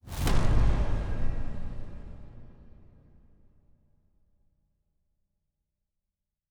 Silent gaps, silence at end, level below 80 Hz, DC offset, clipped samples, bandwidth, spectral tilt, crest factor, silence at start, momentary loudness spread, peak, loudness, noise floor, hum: none; 4.05 s; -32 dBFS; under 0.1%; under 0.1%; 15.5 kHz; -6 dB/octave; 20 dB; 0.05 s; 22 LU; -10 dBFS; -31 LUFS; -86 dBFS; none